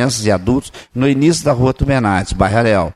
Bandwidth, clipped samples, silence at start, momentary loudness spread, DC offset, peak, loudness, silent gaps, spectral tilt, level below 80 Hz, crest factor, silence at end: 13.5 kHz; under 0.1%; 0 s; 5 LU; under 0.1%; -2 dBFS; -15 LUFS; none; -5.5 dB/octave; -30 dBFS; 14 dB; 0.05 s